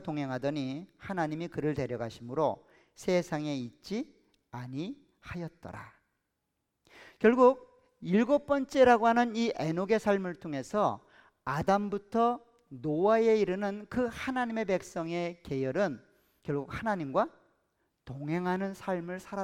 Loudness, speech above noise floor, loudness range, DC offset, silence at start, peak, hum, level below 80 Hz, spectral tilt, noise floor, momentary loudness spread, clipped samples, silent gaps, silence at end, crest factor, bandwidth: -30 LUFS; 53 dB; 10 LU; under 0.1%; 0 s; -12 dBFS; none; -64 dBFS; -6.5 dB/octave; -83 dBFS; 17 LU; under 0.1%; none; 0 s; 20 dB; 15 kHz